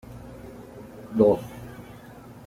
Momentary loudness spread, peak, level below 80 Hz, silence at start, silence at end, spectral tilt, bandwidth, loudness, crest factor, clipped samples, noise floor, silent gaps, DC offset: 24 LU; -6 dBFS; -54 dBFS; 0.1 s; 0.55 s; -8.5 dB/octave; 16 kHz; -23 LUFS; 22 dB; under 0.1%; -45 dBFS; none; under 0.1%